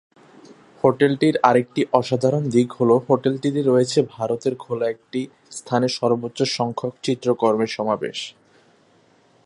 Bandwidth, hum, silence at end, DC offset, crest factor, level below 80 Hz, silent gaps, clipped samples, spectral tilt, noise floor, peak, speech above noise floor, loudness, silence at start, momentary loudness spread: 11.5 kHz; none; 1.15 s; under 0.1%; 20 dB; -64 dBFS; none; under 0.1%; -6 dB/octave; -57 dBFS; 0 dBFS; 37 dB; -21 LUFS; 0.5 s; 10 LU